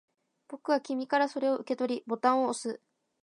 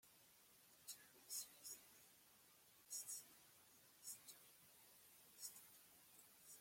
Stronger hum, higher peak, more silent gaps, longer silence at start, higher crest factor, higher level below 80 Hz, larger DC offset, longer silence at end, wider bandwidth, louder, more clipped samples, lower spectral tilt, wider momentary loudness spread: neither; first, -12 dBFS vs -38 dBFS; neither; first, 0.5 s vs 0.05 s; about the same, 20 dB vs 24 dB; first, -84 dBFS vs under -90 dBFS; neither; first, 0.45 s vs 0 s; second, 11 kHz vs 16.5 kHz; first, -30 LUFS vs -57 LUFS; neither; first, -3.5 dB/octave vs 1 dB/octave; second, 13 LU vs 17 LU